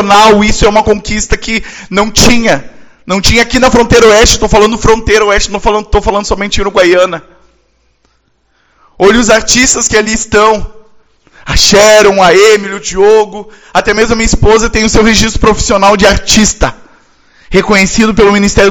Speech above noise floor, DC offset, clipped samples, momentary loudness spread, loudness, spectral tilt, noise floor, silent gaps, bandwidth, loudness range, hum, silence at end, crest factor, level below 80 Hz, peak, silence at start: 47 dB; under 0.1%; 4%; 9 LU; -7 LUFS; -3.5 dB/octave; -54 dBFS; none; over 20 kHz; 4 LU; none; 0 s; 8 dB; -20 dBFS; 0 dBFS; 0 s